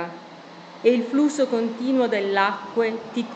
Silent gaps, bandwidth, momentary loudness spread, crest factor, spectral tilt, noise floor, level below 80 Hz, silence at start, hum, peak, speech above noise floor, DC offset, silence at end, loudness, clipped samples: none; 8.8 kHz; 20 LU; 18 dB; -5 dB/octave; -42 dBFS; -76 dBFS; 0 s; none; -4 dBFS; 20 dB; under 0.1%; 0 s; -22 LUFS; under 0.1%